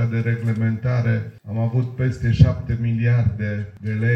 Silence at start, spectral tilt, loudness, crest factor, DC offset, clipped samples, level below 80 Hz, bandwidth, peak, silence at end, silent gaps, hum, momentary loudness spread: 0 s; -9 dB/octave; -21 LUFS; 20 dB; under 0.1%; under 0.1%; -36 dBFS; 6.2 kHz; 0 dBFS; 0 s; none; none; 9 LU